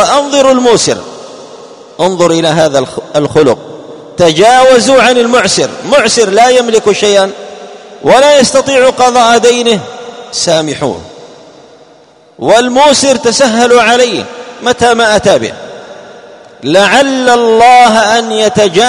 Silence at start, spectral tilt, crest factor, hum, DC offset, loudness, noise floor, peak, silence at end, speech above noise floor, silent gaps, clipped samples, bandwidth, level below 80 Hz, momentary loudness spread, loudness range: 0 s; -3 dB/octave; 8 dB; none; under 0.1%; -7 LUFS; -40 dBFS; 0 dBFS; 0 s; 34 dB; none; 2%; 13 kHz; -44 dBFS; 16 LU; 4 LU